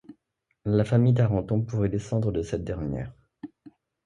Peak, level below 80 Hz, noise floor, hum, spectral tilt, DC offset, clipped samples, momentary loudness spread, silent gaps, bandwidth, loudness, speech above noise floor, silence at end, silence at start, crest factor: -10 dBFS; -46 dBFS; -76 dBFS; none; -9 dB/octave; under 0.1%; under 0.1%; 23 LU; none; 9.4 kHz; -26 LUFS; 52 dB; 0.35 s; 0.1 s; 18 dB